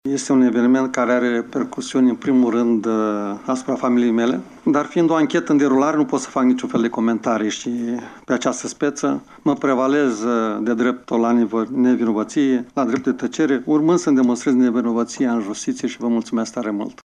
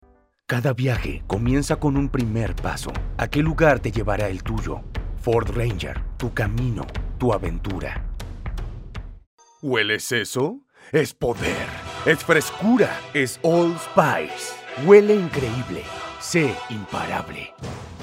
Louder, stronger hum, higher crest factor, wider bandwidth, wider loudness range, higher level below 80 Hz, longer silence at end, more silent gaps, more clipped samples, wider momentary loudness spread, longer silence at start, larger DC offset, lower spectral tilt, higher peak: first, -19 LUFS vs -22 LUFS; neither; second, 12 dB vs 22 dB; second, 10 kHz vs 16 kHz; second, 3 LU vs 8 LU; second, -62 dBFS vs -34 dBFS; about the same, 0.1 s vs 0 s; second, none vs 9.27-9.38 s; neither; second, 7 LU vs 15 LU; second, 0.05 s vs 0.5 s; neither; about the same, -5.5 dB/octave vs -5.5 dB/octave; second, -6 dBFS vs 0 dBFS